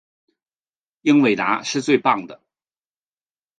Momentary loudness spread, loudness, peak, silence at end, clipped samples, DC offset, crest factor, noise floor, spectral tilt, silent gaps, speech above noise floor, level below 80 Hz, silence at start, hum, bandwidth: 7 LU; -19 LUFS; -2 dBFS; 1.25 s; under 0.1%; under 0.1%; 20 dB; under -90 dBFS; -4.5 dB/octave; none; over 72 dB; -70 dBFS; 1.05 s; none; 9.4 kHz